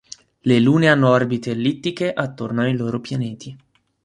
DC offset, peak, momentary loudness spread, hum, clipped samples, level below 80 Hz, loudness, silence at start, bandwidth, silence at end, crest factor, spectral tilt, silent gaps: under 0.1%; -2 dBFS; 12 LU; none; under 0.1%; -58 dBFS; -19 LUFS; 0.45 s; 11 kHz; 0.5 s; 18 dB; -7 dB/octave; none